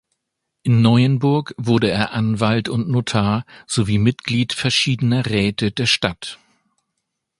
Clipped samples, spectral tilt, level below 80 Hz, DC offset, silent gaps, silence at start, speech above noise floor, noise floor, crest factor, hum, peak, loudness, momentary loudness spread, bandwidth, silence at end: under 0.1%; -5.5 dB/octave; -46 dBFS; under 0.1%; none; 0.65 s; 60 dB; -78 dBFS; 18 dB; none; 0 dBFS; -18 LUFS; 7 LU; 11.5 kHz; 1.05 s